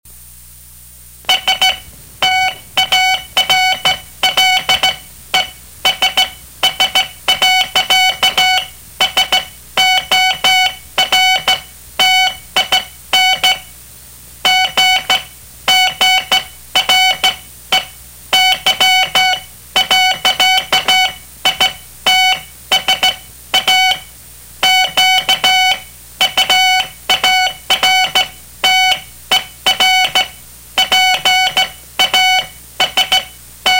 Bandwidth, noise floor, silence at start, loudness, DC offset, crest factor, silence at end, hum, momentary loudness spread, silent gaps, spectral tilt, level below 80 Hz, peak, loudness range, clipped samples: 16.5 kHz; -38 dBFS; 0.15 s; -11 LUFS; under 0.1%; 12 dB; 0 s; none; 7 LU; none; 1 dB/octave; -44 dBFS; -2 dBFS; 2 LU; under 0.1%